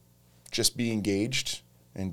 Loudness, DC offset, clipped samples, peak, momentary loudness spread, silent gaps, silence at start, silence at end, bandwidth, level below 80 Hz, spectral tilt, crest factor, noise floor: -29 LUFS; under 0.1%; under 0.1%; -8 dBFS; 12 LU; none; 0 s; 0 s; 19.5 kHz; -54 dBFS; -3.5 dB/octave; 22 dB; -57 dBFS